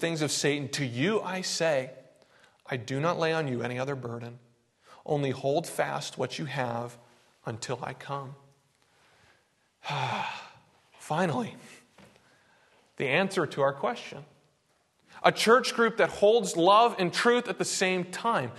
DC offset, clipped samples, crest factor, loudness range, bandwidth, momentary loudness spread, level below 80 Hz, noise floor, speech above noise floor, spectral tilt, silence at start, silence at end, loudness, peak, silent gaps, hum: under 0.1%; under 0.1%; 24 dB; 13 LU; 12.5 kHz; 17 LU; -72 dBFS; -70 dBFS; 42 dB; -4 dB/octave; 0 s; 0 s; -28 LUFS; -6 dBFS; none; none